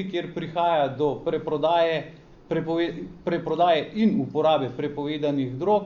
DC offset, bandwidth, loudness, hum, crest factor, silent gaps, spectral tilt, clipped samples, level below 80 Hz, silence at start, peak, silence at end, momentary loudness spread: under 0.1%; 7 kHz; -25 LUFS; none; 14 dB; none; -7.5 dB/octave; under 0.1%; -56 dBFS; 0 s; -10 dBFS; 0 s; 9 LU